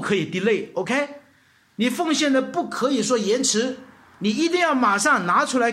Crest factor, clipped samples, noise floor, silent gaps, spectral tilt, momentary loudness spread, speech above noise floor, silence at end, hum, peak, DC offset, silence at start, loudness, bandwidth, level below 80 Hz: 16 dB; under 0.1%; -58 dBFS; none; -3.5 dB/octave; 7 LU; 37 dB; 0 s; none; -6 dBFS; under 0.1%; 0 s; -21 LUFS; 15.5 kHz; -70 dBFS